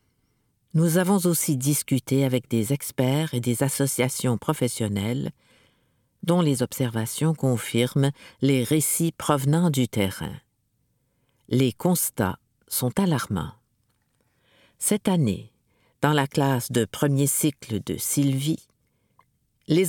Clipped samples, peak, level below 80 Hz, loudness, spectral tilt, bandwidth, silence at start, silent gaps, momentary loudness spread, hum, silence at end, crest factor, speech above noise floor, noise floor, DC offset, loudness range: under 0.1%; -4 dBFS; -60 dBFS; -24 LUFS; -5 dB/octave; 19 kHz; 0.75 s; none; 7 LU; none; 0 s; 20 dB; 48 dB; -71 dBFS; under 0.1%; 4 LU